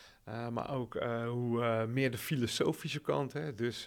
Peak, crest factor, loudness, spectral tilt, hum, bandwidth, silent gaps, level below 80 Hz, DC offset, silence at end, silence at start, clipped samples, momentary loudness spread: -18 dBFS; 16 dB; -35 LUFS; -5.5 dB/octave; none; 19 kHz; none; -68 dBFS; under 0.1%; 0 s; 0 s; under 0.1%; 6 LU